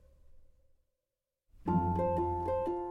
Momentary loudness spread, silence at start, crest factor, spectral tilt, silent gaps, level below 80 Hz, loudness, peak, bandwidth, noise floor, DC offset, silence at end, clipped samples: 3 LU; 0.35 s; 16 dB; -10.5 dB/octave; none; -54 dBFS; -33 LUFS; -18 dBFS; 5.6 kHz; -89 dBFS; under 0.1%; 0 s; under 0.1%